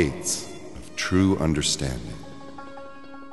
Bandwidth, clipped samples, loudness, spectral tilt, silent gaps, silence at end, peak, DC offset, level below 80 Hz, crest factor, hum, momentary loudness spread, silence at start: 12 kHz; under 0.1%; -24 LUFS; -4 dB/octave; none; 0 s; -6 dBFS; 0.8%; -42 dBFS; 20 dB; none; 20 LU; 0 s